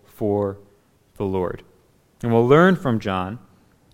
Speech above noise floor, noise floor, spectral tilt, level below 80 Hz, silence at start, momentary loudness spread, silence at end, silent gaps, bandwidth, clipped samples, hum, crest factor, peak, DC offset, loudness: 38 dB; -58 dBFS; -8 dB/octave; -52 dBFS; 0.2 s; 19 LU; 0.55 s; none; 15.5 kHz; under 0.1%; none; 18 dB; -2 dBFS; under 0.1%; -20 LUFS